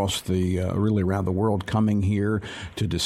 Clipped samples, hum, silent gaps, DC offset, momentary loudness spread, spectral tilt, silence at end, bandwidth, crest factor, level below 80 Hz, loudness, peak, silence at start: under 0.1%; none; none; under 0.1%; 6 LU; -6 dB/octave; 0 s; 14.5 kHz; 12 dB; -50 dBFS; -24 LUFS; -10 dBFS; 0 s